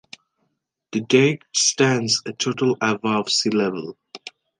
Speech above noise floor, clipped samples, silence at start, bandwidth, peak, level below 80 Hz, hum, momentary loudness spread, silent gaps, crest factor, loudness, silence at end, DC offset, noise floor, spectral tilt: 53 dB; under 0.1%; 0.95 s; 11 kHz; -2 dBFS; -68 dBFS; none; 17 LU; none; 20 dB; -20 LUFS; 0.3 s; under 0.1%; -73 dBFS; -3.5 dB/octave